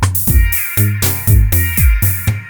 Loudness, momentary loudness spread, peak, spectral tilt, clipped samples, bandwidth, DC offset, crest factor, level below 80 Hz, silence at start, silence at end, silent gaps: -12 LUFS; 3 LU; 0 dBFS; -4.5 dB/octave; under 0.1%; over 20 kHz; under 0.1%; 12 dB; -16 dBFS; 0 s; 0 s; none